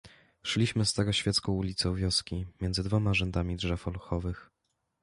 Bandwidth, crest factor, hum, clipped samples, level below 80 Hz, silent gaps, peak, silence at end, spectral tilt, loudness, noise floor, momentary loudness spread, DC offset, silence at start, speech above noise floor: 11.5 kHz; 16 dB; none; under 0.1%; -44 dBFS; none; -14 dBFS; 0.6 s; -4.5 dB/octave; -30 LUFS; -80 dBFS; 8 LU; under 0.1%; 0.05 s; 50 dB